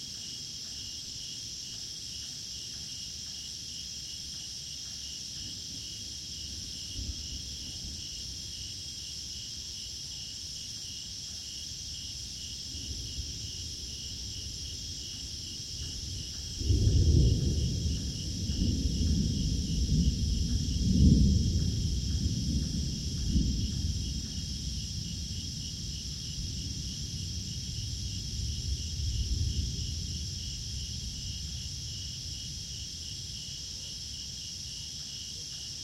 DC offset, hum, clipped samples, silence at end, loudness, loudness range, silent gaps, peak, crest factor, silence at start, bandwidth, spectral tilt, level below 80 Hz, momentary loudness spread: under 0.1%; none; under 0.1%; 0 s; -34 LUFS; 9 LU; none; -10 dBFS; 22 dB; 0 s; 15.5 kHz; -4 dB/octave; -38 dBFS; 9 LU